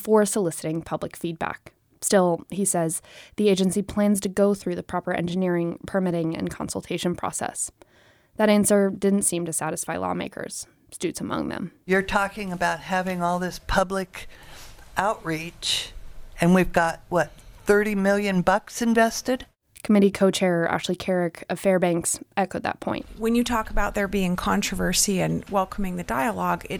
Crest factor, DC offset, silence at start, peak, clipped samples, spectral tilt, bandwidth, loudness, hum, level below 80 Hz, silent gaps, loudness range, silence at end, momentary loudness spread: 18 dB; under 0.1%; 0 s; -6 dBFS; under 0.1%; -4.5 dB/octave; over 20 kHz; -24 LUFS; none; -42 dBFS; none; 5 LU; 0 s; 11 LU